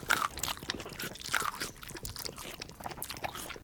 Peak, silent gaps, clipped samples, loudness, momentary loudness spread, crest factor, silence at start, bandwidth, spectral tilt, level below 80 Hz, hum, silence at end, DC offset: -10 dBFS; none; under 0.1%; -37 LUFS; 11 LU; 28 dB; 0 s; over 20 kHz; -1.5 dB/octave; -56 dBFS; none; 0 s; under 0.1%